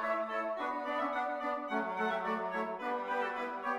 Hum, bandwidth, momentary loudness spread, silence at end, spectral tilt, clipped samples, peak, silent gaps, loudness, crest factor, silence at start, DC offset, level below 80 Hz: none; 15.5 kHz; 3 LU; 0 s; -5.5 dB/octave; under 0.1%; -22 dBFS; none; -35 LUFS; 14 dB; 0 s; under 0.1%; -76 dBFS